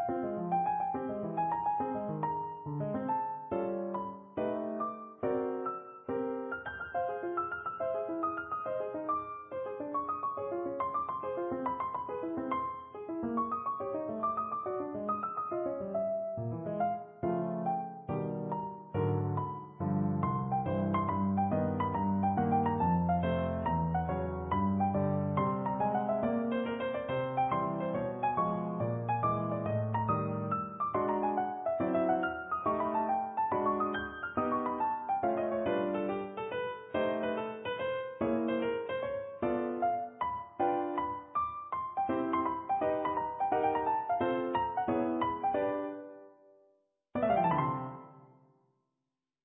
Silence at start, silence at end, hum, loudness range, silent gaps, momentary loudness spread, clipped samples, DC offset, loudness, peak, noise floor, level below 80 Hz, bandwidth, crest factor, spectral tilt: 0 s; 1.2 s; none; 5 LU; none; 7 LU; under 0.1%; under 0.1%; -34 LUFS; -18 dBFS; -88 dBFS; -56 dBFS; 3.8 kHz; 16 dB; -4.5 dB/octave